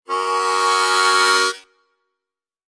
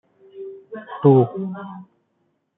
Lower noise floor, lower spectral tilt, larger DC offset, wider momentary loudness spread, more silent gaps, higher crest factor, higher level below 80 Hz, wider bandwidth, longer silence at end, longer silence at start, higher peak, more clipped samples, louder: first, -85 dBFS vs -69 dBFS; second, 2.5 dB/octave vs -13.5 dB/octave; neither; second, 7 LU vs 23 LU; neither; about the same, 16 dB vs 20 dB; second, -84 dBFS vs -66 dBFS; first, 11 kHz vs 3.9 kHz; first, 1.1 s vs 0.75 s; second, 0.1 s vs 0.35 s; about the same, -2 dBFS vs -2 dBFS; neither; about the same, -16 LUFS vs -18 LUFS